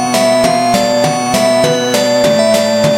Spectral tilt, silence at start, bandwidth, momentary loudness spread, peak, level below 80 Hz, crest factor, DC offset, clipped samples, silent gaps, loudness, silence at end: -4 dB/octave; 0 s; 17 kHz; 2 LU; 0 dBFS; -46 dBFS; 10 dB; under 0.1%; under 0.1%; none; -11 LUFS; 0 s